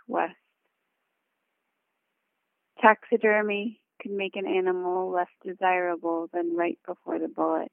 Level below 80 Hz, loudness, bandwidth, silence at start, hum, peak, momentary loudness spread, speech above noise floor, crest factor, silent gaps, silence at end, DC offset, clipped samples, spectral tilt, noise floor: -84 dBFS; -27 LUFS; 3.6 kHz; 0.1 s; none; -4 dBFS; 12 LU; 53 dB; 24 dB; none; 0.05 s; under 0.1%; under 0.1%; -8.5 dB/octave; -79 dBFS